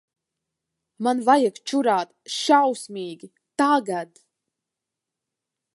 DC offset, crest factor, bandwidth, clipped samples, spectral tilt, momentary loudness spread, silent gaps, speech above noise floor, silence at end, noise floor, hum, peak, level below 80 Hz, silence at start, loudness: under 0.1%; 22 dB; 11.5 kHz; under 0.1%; -3.5 dB/octave; 16 LU; none; 64 dB; 1.7 s; -86 dBFS; none; -4 dBFS; -82 dBFS; 1 s; -22 LUFS